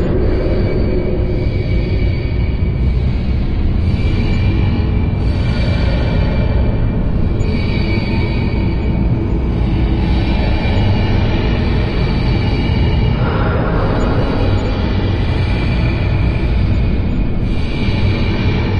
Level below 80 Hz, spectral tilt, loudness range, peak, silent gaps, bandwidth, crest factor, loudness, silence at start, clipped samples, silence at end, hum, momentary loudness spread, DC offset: -18 dBFS; -8.5 dB/octave; 1 LU; -4 dBFS; none; 7.2 kHz; 10 dB; -16 LUFS; 0 s; under 0.1%; 0 s; none; 2 LU; under 0.1%